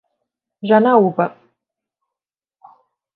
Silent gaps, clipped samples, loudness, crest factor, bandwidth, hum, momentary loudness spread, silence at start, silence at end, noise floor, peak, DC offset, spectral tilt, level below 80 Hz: none; under 0.1%; -15 LUFS; 20 dB; 4.5 kHz; none; 12 LU; 0.65 s; 1.85 s; -89 dBFS; 0 dBFS; under 0.1%; -10 dB/octave; -72 dBFS